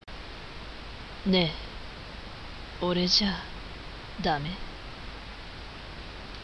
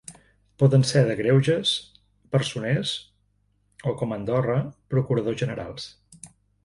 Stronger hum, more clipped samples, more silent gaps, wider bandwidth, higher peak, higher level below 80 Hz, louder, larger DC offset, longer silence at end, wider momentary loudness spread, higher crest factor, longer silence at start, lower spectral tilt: second, none vs 50 Hz at -50 dBFS; neither; neither; about the same, 11 kHz vs 11.5 kHz; second, -10 dBFS vs -6 dBFS; first, -44 dBFS vs -56 dBFS; second, -28 LUFS vs -24 LUFS; neither; second, 0 s vs 0.35 s; first, 18 LU vs 14 LU; about the same, 22 dB vs 20 dB; about the same, 0.05 s vs 0.1 s; second, -4.5 dB/octave vs -6 dB/octave